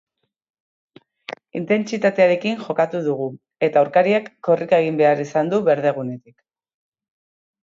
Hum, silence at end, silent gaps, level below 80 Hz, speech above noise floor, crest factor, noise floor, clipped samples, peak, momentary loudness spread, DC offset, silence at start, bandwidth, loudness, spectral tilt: none; 1.6 s; none; -70 dBFS; 19 dB; 18 dB; -38 dBFS; under 0.1%; -4 dBFS; 14 LU; under 0.1%; 1.3 s; 7.6 kHz; -19 LUFS; -6.5 dB/octave